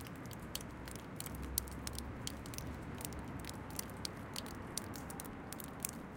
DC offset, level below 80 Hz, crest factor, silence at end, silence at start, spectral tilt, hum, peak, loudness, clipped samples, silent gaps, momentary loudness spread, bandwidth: under 0.1%; -54 dBFS; 32 dB; 0 s; 0 s; -3.5 dB/octave; none; -12 dBFS; -45 LUFS; under 0.1%; none; 7 LU; 17 kHz